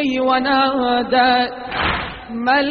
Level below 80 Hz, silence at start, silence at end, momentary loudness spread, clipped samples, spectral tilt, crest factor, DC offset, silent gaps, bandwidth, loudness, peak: -40 dBFS; 0 s; 0 s; 8 LU; under 0.1%; -1.5 dB/octave; 16 dB; under 0.1%; none; 6 kHz; -17 LUFS; -2 dBFS